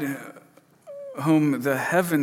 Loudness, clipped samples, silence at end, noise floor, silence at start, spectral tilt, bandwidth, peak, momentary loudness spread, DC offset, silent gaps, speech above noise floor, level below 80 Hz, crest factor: -23 LUFS; under 0.1%; 0 s; -53 dBFS; 0 s; -6.5 dB/octave; 17 kHz; -6 dBFS; 21 LU; under 0.1%; none; 30 dB; -74 dBFS; 18 dB